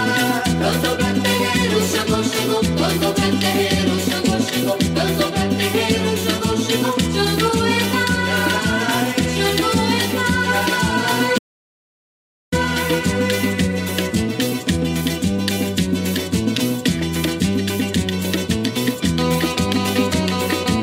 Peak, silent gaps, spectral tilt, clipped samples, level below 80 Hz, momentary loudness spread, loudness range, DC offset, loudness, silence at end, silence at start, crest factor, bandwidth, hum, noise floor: -4 dBFS; 11.39-12.52 s; -4.5 dB/octave; under 0.1%; -38 dBFS; 3 LU; 2 LU; under 0.1%; -18 LUFS; 0 s; 0 s; 14 dB; 16.5 kHz; none; under -90 dBFS